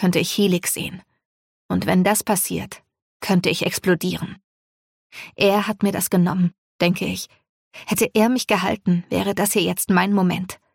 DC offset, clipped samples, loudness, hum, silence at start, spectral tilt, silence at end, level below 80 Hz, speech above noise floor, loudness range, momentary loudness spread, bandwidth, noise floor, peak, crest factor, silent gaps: under 0.1%; under 0.1%; -20 LUFS; none; 0 s; -4.5 dB/octave; 0.2 s; -56 dBFS; over 70 dB; 2 LU; 12 LU; 17 kHz; under -90 dBFS; -6 dBFS; 16 dB; 1.25-1.69 s, 3.02-3.20 s, 4.44-5.10 s, 6.58-6.79 s, 7.49-7.71 s